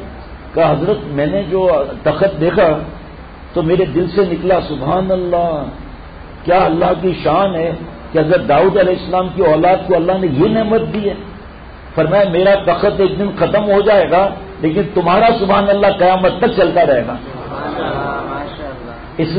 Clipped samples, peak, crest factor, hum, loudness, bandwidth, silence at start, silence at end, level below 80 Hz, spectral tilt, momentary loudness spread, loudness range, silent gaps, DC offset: under 0.1%; -2 dBFS; 12 dB; none; -14 LUFS; 5 kHz; 0 s; 0 s; -36 dBFS; -12 dB/octave; 16 LU; 3 LU; none; 0.2%